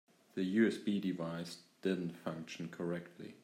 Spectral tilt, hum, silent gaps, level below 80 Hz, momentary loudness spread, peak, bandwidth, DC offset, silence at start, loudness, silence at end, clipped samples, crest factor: -6.5 dB/octave; none; none; -82 dBFS; 13 LU; -20 dBFS; 15.5 kHz; under 0.1%; 0.35 s; -38 LUFS; 0.05 s; under 0.1%; 20 dB